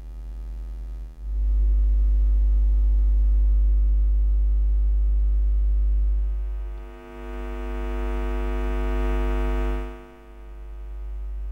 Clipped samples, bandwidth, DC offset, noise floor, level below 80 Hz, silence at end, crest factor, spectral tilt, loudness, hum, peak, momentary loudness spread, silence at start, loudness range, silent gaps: under 0.1%; 3.4 kHz; under 0.1%; -42 dBFS; -22 dBFS; 0 s; 8 dB; -8.5 dB/octave; -25 LUFS; none; -14 dBFS; 16 LU; 0 s; 7 LU; none